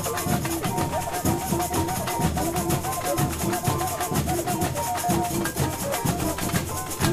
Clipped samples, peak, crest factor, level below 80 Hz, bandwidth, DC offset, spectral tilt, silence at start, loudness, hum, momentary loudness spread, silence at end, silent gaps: under 0.1%; -6 dBFS; 20 dB; -40 dBFS; 16 kHz; under 0.1%; -4.5 dB/octave; 0 s; -25 LUFS; none; 2 LU; 0 s; none